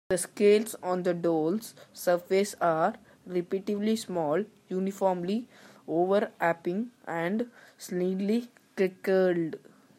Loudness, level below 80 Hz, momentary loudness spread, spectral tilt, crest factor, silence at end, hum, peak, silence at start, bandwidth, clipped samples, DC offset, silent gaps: -29 LUFS; -74 dBFS; 10 LU; -5.5 dB/octave; 18 dB; 0.4 s; none; -12 dBFS; 0.1 s; 16 kHz; under 0.1%; under 0.1%; none